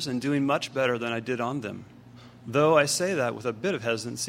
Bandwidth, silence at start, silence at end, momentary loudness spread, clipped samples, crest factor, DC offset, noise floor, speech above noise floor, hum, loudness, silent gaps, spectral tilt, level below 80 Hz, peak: 16 kHz; 0 s; 0 s; 11 LU; under 0.1%; 20 dB; under 0.1%; -49 dBFS; 22 dB; 60 Hz at -50 dBFS; -26 LUFS; none; -4.5 dB/octave; -66 dBFS; -6 dBFS